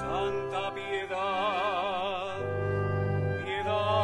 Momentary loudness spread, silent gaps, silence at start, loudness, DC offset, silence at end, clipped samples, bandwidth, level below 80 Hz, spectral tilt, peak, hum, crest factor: 5 LU; none; 0 s; -31 LUFS; under 0.1%; 0 s; under 0.1%; 11 kHz; -56 dBFS; -6.5 dB/octave; -16 dBFS; none; 14 dB